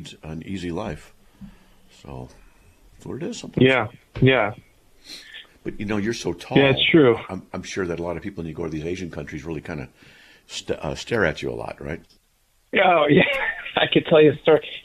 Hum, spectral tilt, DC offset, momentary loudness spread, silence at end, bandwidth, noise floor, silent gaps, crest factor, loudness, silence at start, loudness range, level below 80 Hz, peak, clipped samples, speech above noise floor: none; -6 dB/octave; under 0.1%; 21 LU; 0.05 s; 13.5 kHz; -63 dBFS; none; 20 dB; -21 LUFS; 0 s; 10 LU; -48 dBFS; -2 dBFS; under 0.1%; 41 dB